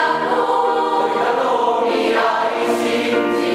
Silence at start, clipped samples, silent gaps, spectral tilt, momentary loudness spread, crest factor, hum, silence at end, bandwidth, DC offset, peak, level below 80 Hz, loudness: 0 s; under 0.1%; none; -4 dB/octave; 1 LU; 14 dB; none; 0 s; 15 kHz; under 0.1%; -4 dBFS; -58 dBFS; -17 LUFS